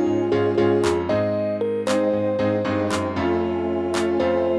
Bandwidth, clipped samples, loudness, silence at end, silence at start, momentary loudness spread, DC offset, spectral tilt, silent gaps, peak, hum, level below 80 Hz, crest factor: 11 kHz; under 0.1%; -22 LUFS; 0 s; 0 s; 4 LU; under 0.1%; -6 dB/octave; none; -8 dBFS; none; -50 dBFS; 12 dB